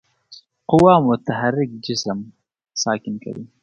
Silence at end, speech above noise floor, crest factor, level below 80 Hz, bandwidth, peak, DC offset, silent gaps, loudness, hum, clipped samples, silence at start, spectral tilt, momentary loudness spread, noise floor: 0.15 s; 29 dB; 20 dB; -52 dBFS; 10.5 kHz; 0 dBFS; under 0.1%; none; -18 LUFS; none; under 0.1%; 0.3 s; -5.5 dB/octave; 17 LU; -48 dBFS